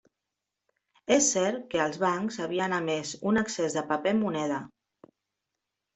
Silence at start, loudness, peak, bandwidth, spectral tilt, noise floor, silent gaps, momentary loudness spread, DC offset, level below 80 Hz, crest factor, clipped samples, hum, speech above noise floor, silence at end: 1.1 s; -28 LUFS; -10 dBFS; 8.2 kHz; -3.5 dB/octave; -86 dBFS; none; 8 LU; under 0.1%; -68 dBFS; 20 dB; under 0.1%; none; 59 dB; 1.3 s